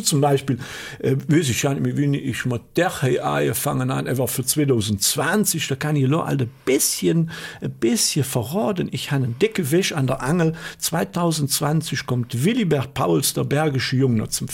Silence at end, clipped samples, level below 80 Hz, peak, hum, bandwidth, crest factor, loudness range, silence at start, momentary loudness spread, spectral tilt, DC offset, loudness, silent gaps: 0 s; under 0.1%; -52 dBFS; -6 dBFS; none; 17 kHz; 16 dB; 2 LU; 0 s; 5 LU; -4.5 dB/octave; under 0.1%; -21 LUFS; none